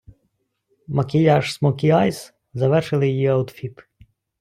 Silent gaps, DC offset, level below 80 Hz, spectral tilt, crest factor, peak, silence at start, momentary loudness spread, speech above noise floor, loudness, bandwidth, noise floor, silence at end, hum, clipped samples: none; under 0.1%; -56 dBFS; -7.5 dB/octave; 16 dB; -4 dBFS; 0.9 s; 18 LU; 52 dB; -19 LUFS; 14 kHz; -71 dBFS; 0.7 s; none; under 0.1%